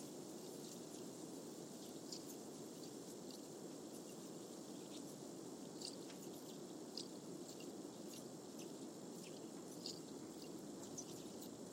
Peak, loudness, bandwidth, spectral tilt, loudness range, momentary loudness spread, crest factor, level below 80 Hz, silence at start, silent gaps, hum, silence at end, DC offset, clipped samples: -32 dBFS; -52 LUFS; 16 kHz; -4 dB/octave; 1 LU; 3 LU; 22 dB; -88 dBFS; 0 s; none; none; 0 s; under 0.1%; under 0.1%